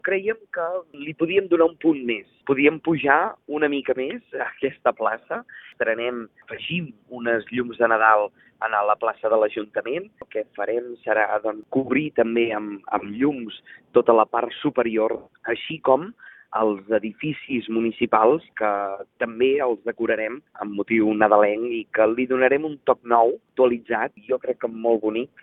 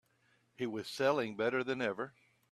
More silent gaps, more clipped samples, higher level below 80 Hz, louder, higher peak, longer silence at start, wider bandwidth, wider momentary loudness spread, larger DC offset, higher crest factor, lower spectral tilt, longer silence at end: neither; neither; first, -66 dBFS vs -80 dBFS; first, -23 LUFS vs -36 LUFS; first, -2 dBFS vs -16 dBFS; second, 0.05 s vs 0.6 s; second, 4 kHz vs 14 kHz; about the same, 12 LU vs 10 LU; neither; about the same, 20 dB vs 20 dB; first, -9.5 dB/octave vs -5 dB/octave; second, 0.15 s vs 0.4 s